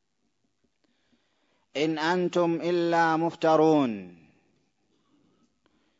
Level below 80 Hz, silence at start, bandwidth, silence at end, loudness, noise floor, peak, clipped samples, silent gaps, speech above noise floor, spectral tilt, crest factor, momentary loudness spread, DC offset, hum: -78 dBFS; 1.75 s; 7.8 kHz; 1.9 s; -25 LUFS; -76 dBFS; -10 dBFS; under 0.1%; none; 52 dB; -6 dB/octave; 18 dB; 9 LU; under 0.1%; none